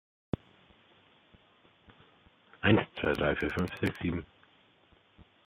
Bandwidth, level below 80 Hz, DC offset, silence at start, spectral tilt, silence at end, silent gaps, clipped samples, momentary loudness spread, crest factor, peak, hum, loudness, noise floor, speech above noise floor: 14 kHz; -56 dBFS; under 0.1%; 2.6 s; -7 dB/octave; 0.25 s; none; under 0.1%; 13 LU; 24 dB; -10 dBFS; none; -31 LUFS; -65 dBFS; 33 dB